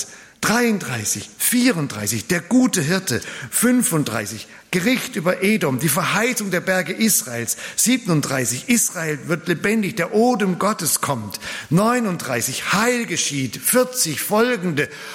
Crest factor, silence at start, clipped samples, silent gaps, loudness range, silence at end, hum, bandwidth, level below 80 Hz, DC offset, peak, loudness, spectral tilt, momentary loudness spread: 16 dB; 0 s; under 0.1%; none; 1 LU; 0 s; none; 16.5 kHz; -60 dBFS; under 0.1%; -4 dBFS; -19 LUFS; -3.5 dB/octave; 7 LU